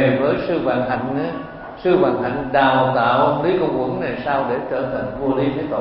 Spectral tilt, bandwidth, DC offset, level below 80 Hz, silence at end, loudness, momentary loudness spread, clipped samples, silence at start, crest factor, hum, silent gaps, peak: -11.5 dB/octave; 5.6 kHz; under 0.1%; -46 dBFS; 0 s; -19 LUFS; 8 LU; under 0.1%; 0 s; 16 dB; none; none; -2 dBFS